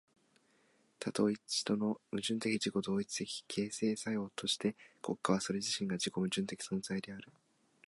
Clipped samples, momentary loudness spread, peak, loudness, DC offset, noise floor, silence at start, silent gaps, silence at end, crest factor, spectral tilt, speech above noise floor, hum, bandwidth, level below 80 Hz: under 0.1%; 7 LU; -16 dBFS; -37 LUFS; under 0.1%; -72 dBFS; 1 s; none; 0.6 s; 20 dB; -4 dB/octave; 35 dB; none; 11.5 kHz; -74 dBFS